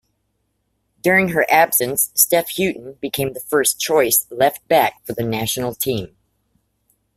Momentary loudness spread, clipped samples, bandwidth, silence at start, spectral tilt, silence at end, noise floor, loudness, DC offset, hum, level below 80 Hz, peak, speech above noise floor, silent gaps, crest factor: 9 LU; under 0.1%; 16 kHz; 1.05 s; -3 dB/octave; 1.1 s; -70 dBFS; -17 LUFS; under 0.1%; none; -54 dBFS; 0 dBFS; 52 dB; none; 20 dB